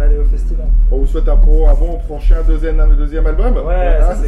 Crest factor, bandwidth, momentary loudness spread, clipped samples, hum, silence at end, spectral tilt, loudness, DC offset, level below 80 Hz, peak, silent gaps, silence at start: 8 dB; 3.4 kHz; 4 LU; under 0.1%; none; 0 s; -8.5 dB/octave; -16 LUFS; under 0.1%; -10 dBFS; 0 dBFS; none; 0 s